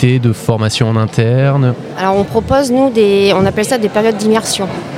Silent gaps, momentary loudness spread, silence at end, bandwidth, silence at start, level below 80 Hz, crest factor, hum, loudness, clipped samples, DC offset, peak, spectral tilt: none; 5 LU; 0 s; 15.5 kHz; 0 s; -40 dBFS; 12 dB; none; -12 LUFS; under 0.1%; under 0.1%; 0 dBFS; -6 dB/octave